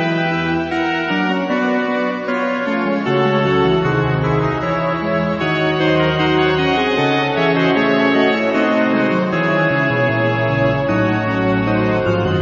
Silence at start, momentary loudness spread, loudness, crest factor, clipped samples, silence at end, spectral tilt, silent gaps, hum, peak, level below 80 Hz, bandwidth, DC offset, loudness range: 0 s; 4 LU; -16 LUFS; 14 dB; under 0.1%; 0 s; -7 dB/octave; none; none; -2 dBFS; -40 dBFS; 7.6 kHz; under 0.1%; 2 LU